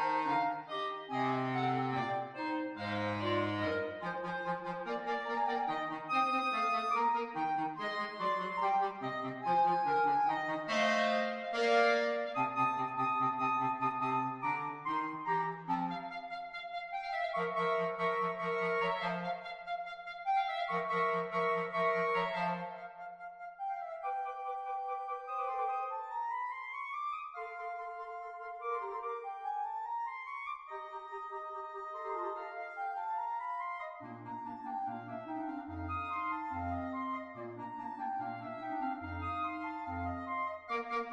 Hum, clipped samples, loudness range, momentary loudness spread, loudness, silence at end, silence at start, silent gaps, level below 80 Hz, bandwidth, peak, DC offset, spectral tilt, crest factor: none; under 0.1%; 9 LU; 11 LU; -36 LUFS; 0 s; 0 s; none; -68 dBFS; 10.5 kHz; -16 dBFS; under 0.1%; -5.5 dB/octave; 20 dB